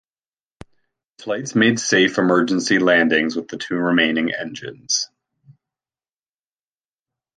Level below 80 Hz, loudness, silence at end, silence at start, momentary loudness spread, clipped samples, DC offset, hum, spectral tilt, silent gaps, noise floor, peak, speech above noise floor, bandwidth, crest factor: -64 dBFS; -18 LUFS; 2.3 s; 1.2 s; 12 LU; under 0.1%; under 0.1%; none; -3.5 dB/octave; none; under -90 dBFS; -2 dBFS; over 71 dB; 10.5 kHz; 18 dB